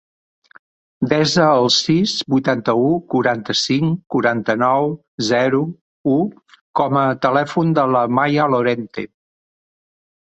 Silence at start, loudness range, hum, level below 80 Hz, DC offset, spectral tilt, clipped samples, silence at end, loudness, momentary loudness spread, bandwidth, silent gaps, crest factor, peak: 1 s; 2 LU; none; -58 dBFS; under 0.1%; -5 dB/octave; under 0.1%; 1.2 s; -17 LUFS; 10 LU; 8.2 kHz; 5.08-5.18 s, 5.81-6.04 s, 6.61-6.74 s; 16 dB; -2 dBFS